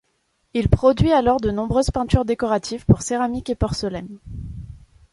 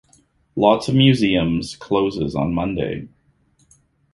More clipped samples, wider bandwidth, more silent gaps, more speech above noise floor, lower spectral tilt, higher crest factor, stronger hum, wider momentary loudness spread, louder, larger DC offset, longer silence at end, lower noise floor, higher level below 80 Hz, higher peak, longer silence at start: neither; about the same, 11.5 kHz vs 11.5 kHz; neither; first, 49 dB vs 42 dB; about the same, -6.5 dB/octave vs -6.5 dB/octave; about the same, 20 dB vs 18 dB; neither; first, 18 LU vs 11 LU; about the same, -20 LUFS vs -19 LUFS; neither; second, 0.35 s vs 1.05 s; first, -68 dBFS vs -60 dBFS; first, -32 dBFS vs -44 dBFS; about the same, -2 dBFS vs -2 dBFS; about the same, 0.55 s vs 0.55 s